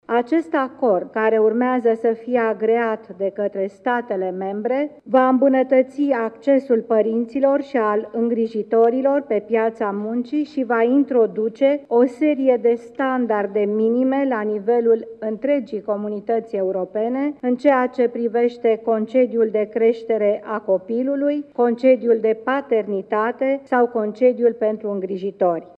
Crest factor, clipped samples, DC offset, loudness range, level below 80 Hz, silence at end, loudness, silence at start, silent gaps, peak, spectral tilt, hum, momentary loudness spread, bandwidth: 16 dB; under 0.1%; under 0.1%; 2 LU; -70 dBFS; 0.1 s; -20 LUFS; 0.1 s; none; -4 dBFS; -8 dB/octave; none; 7 LU; 5.4 kHz